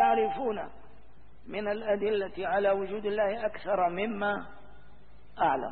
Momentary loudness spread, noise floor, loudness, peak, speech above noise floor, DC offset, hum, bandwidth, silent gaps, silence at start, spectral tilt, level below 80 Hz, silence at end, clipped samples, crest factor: 9 LU; -57 dBFS; -30 LUFS; -12 dBFS; 27 dB; 0.6%; none; 4.6 kHz; none; 0 s; -9 dB/octave; -58 dBFS; 0 s; under 0.1%; 18 dB